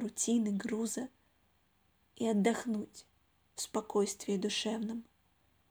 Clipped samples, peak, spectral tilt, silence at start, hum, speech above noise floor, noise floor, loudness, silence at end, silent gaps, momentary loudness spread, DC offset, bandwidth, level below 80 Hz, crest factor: under 0.1%; -16 dBFS; -4 dB/octave; 0 s; none; 38 dB; -73 dBFS; -35 LUFS; 0.65 s; none; 12 LU; under 0.1%; over 20 kHz; -76 dBFS; 20 dB